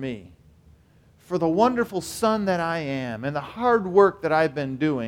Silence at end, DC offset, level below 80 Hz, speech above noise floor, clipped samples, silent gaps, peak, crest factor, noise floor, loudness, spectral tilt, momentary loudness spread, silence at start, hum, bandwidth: 0 s; under 0.1%; -56 dBFS; 33 dB; under 0.1%; none; -4 dBFS; 20 dB; -56 dBFS; -23 LUFS; -6 dB/octave; 11 LU; 0 s; none; 17 kHz